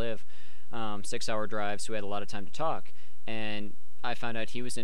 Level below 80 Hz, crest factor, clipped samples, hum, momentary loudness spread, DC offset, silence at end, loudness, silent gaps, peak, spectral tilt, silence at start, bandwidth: -64 dBFS; 18 dB; under 0.1%; none; 11 LU; 9%; 0 s; -36 LUFS; none; -14 dBFS; -4 dB/octave; 0 s; 17 kHz